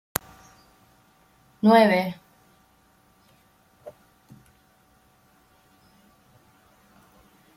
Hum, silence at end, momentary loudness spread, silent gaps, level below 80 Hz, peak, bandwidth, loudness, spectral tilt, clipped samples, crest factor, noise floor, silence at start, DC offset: none; 3.65 s; 31 LU; none; -66 dBFS; 0 dBFS; 16 kHz; -21 LUFS; -5 dB/octave; under 0.1%; 28 dB; -61 dBFS; 1.65 s; under 0.1%